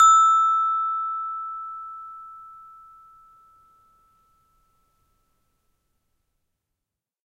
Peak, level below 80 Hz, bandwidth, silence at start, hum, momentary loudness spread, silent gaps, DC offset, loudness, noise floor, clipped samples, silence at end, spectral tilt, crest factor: -6 dBFS; -70 dBFS; 11 kHz; 0 s; none; 26 LU; none; under 0.1%; -21 LUFS; -86 dBFS; under 0.1%; 4.7 s; 2.5 dB/octave; 20 dB